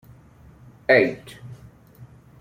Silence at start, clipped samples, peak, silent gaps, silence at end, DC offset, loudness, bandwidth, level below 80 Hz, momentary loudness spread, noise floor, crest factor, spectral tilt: 0.9 s; under 0.1%; -4 dBFS; none; 0.35 s; under 0.1%; -20 LUFS; 15.5 kHz; -58 dBFS; 24 LU; -49 dBFS; 22 dB; -6.5 dB/octave